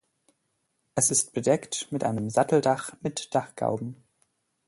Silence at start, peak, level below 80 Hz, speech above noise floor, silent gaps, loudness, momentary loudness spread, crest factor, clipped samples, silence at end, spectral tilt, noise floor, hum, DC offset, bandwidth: 0.95 s; -8 dBFS; -66 dBFS; 49 dB; none; -26 LUFS; 11 LU; 20 dB; under 0.1%; 0.75 s; -4 dB/octave; -76 dBFS; none; under 0.1%; 12 kHz